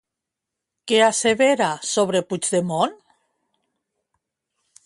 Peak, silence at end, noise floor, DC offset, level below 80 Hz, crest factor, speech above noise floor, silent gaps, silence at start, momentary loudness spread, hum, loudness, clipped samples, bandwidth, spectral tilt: -4 dBFS; 1.9 s; -84 dBFS; under 0.1%; -66 dBFS; 20 dB; 65 dB; none; 0.85 s; 6 LU; none; -20 LUFS; under 0.1%; 11.5 kHz; -3 dB/octave